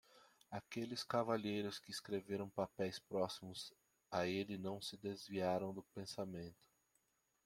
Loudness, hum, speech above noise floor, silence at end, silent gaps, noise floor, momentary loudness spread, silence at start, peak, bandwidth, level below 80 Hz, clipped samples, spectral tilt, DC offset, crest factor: -44 LUFS; none; 38 dB; 0.9 s; none; -82 dBFS; 10 LU; 0.15 s; -24 dBFS; 16.5 kHz; -80 dBFS; under 0.1%; -5 dB/octave; under 0.1%; 20 dB